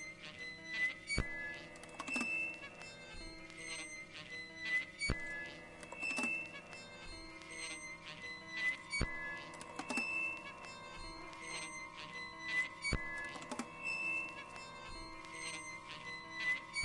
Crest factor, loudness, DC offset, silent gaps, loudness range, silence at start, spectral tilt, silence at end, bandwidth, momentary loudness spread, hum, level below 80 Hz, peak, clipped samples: 24 dB; -42 LUFS; under 0.1%; none; 2 LU; 0 s; -2.5 dB/octave; 0 s; 11.5 kHz; 13 LU; none; -56 dBFS; -18 dBFS; under 0.1%